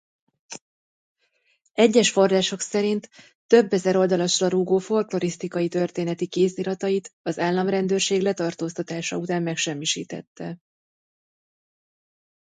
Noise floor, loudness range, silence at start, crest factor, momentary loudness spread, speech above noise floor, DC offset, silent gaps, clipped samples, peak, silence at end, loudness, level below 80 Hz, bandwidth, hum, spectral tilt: -68 dBFS; 8 LU; 0.5 s; 20 dB; 16 LU; 46 dB; under 0.1%; 0.61-1.16 s, 3.35-3.49 s, 7.13-7.24 s, 10.27-10.36 s; under 0.1%; -4 dBFS; 1.9 s; -23 LUFS; -70 dBFS; 9.6 kHz; none; -4.5 dB/octave